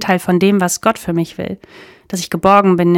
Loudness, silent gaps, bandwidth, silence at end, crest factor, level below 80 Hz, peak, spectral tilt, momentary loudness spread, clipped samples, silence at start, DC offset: -14 LUFS; none; 17 kHz; 0 s; 14 dB; -48 dBFS; 0 dBFS; -5.5 dB/octave; 15 LU; 0.2%; 0 s; under 0.1%